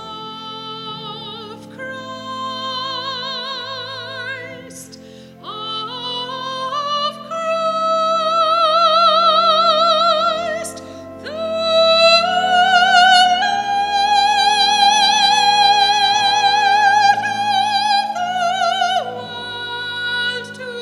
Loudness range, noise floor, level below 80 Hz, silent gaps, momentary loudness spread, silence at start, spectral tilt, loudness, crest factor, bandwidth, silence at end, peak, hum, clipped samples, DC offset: 13 LU; -39 dBFS; -58 dBFS; none; 17 LU; 0 s; -1.5 dB/octave; -15 LUFS; 16 dB; 13 kHz; 0 s; 0 dBFS; none; under 0.1%; under 0.1%